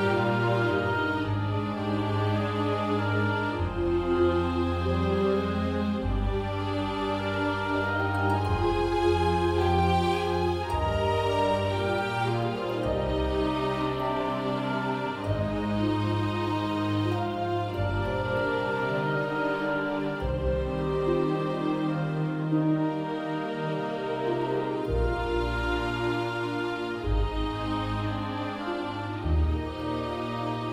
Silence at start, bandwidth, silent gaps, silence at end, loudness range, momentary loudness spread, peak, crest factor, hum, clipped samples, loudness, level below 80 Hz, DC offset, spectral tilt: 0 s; 14 kHz; none; 0 s; 4 LU; 5 LU; -12 dBFS; 14 dB; none; under 0.1%; -28 LUFS; -38 dBFS; under 0.1%; -7.5 dB/octave